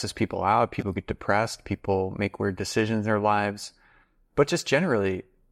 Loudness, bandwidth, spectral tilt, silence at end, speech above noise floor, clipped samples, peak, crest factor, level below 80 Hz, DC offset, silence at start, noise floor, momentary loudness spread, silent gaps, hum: -26 LUFS; 15.5 kHz; -5.5 dB/octave; 0.3 s; 36 dB; under 0.1%; -10 dBFS; 16 dB; -54 dBFS; under 0.1%; 0 s; -61 dBFS; 8 LU; none; none